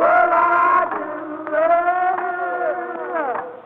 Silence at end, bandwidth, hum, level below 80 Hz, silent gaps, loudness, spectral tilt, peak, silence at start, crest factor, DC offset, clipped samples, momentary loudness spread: 0.05 s; 4.2 kHz; none; -62 dBFS; none; -19 LUFS; -6.5 dB/octave; -4 dBFS; 0 s; 14 dB; under 0.1%; under 0.1%; 11 LU